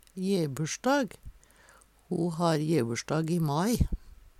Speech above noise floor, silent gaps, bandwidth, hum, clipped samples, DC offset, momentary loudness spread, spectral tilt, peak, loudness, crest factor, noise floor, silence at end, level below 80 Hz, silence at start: 31 dB; none; 15 kHz; none; under 0.1%; under 0.1%; 5 LU; -6 dB/octave; -12 dBFS; -29 LUFS; 18 dB; -59 dBFS; 0.25 s; -42 dBFS; 0.15 s